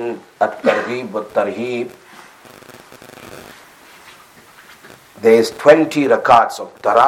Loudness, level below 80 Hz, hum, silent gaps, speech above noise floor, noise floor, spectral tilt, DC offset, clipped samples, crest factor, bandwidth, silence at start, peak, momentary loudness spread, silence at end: -15 LUFS; -60 dBFS; none; none; 30 dB; -44 dBFS; -5 dB/octave; under 0.1%; under 0.1%; 16 dB; 16 kHz; 0 s; 0 dBFS; 24 LU; 0 s